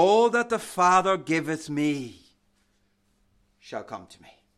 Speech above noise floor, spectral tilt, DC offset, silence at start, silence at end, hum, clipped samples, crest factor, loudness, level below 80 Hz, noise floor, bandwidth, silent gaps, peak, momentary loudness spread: 44 dB; -4.5 dB/octave; under 0.1%; 0 s; 0.55 s; none; under 0.1%; 18 dB; -24 LUFS; -68 dBFS; -68 dBFS; 14.5 kHz; none; -8 dBFS; 20 LU